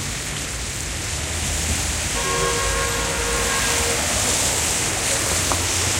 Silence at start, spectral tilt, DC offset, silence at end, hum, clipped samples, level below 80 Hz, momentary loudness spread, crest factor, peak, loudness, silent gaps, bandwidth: 0 s; -2 dB/octave; under 0.1%; 0 s; none; under 0.1%; -32 dBFS; 7 LU; 18 dB; -4 dBFS; -20 LUFS; none; 16 kHz